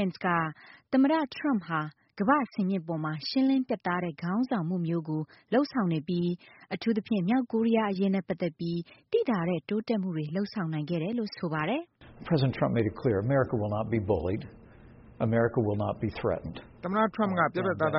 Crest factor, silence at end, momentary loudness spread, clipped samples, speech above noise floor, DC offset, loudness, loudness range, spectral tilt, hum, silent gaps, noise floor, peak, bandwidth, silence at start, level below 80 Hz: 18 dB; 0 s; 8 LU; under 0.1%; 23 dB; under 0.1%; -29 LUFS; 2 LU; -6 dB/octave; none; none; -52 dBFS; -10 dBFS; 5.8 kHz; 0 s; -58 dBFS